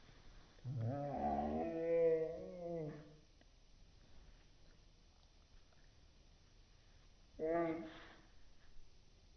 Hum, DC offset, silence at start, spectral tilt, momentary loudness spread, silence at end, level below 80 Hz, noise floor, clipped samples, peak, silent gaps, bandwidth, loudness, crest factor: none; under 0.1%; 0 s; -7 dB/octave; 28 LU; 0.35 s; -64 dBFS; -67 dBFS; under 0.1%; -28 dBFS; none; 6.4 kHz; -41 LUFS; 18 dB